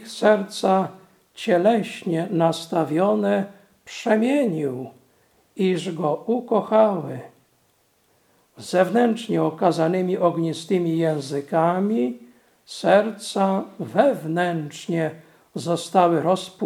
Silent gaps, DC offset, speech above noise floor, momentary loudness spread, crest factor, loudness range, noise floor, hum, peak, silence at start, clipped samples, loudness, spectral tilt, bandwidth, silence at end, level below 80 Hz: none; under 0.1%; 42 dB; 11 LU; 20 dB; 3 LU; -64 dBFS; none; -2 dBFS; 0 s; under 0.1%; -22 LUFS; -6 dB/octave; 15.5 kHz; 0 s; -76 dBFS